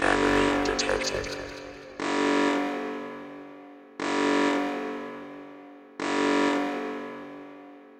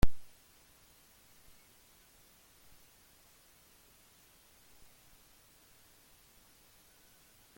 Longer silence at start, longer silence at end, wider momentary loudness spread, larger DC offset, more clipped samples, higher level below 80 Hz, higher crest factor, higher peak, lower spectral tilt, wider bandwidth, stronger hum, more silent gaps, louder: about the same, 0 s vs 0.05 s; second, 0 s vs 7.35 s; first, 21 LU vs 0 LU; neither; neither; about the same, -50 dBFS vs -48 dBFS; second, 20 dB vs 26 dB; about the same, -8 dBFS vs -10 dBFS; second, -3.5 dB/octave vs -5.5 dB/octave; second, 11 kHz vs 17 kHz; neither; neither; first, -27 LUFS vs -56 LUFS